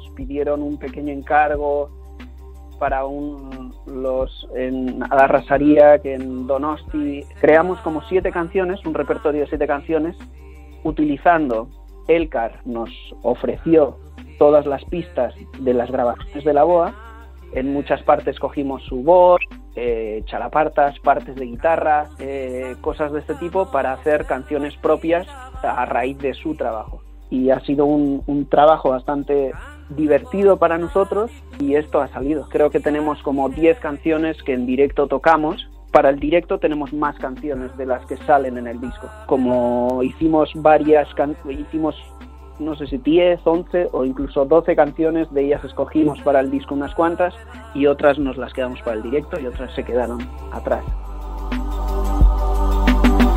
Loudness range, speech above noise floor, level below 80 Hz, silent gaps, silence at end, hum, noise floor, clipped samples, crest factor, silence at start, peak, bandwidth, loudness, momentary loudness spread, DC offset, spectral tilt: 5 LU; 19 dB; -30 dBFS; none; 0 s; none; -37 dBFS; under 0.1%; 18 dB; 0 s; 0 dBFS; 15 kHz; -19 LUFS; 13 LU; under 0.1%; -7.5 dB/octave